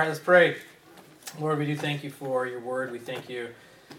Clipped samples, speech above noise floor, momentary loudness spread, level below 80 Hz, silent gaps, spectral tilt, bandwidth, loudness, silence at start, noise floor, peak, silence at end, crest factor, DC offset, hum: under 0.1%; 26 dB; 19 LU; -76 dBFS; none; -5.5 dB/octave; 16.5 kHz; -27 LUFS; 0 s; -52 dBFS; -6 dBFS; 0 s; 22 dB; under 0.1%; none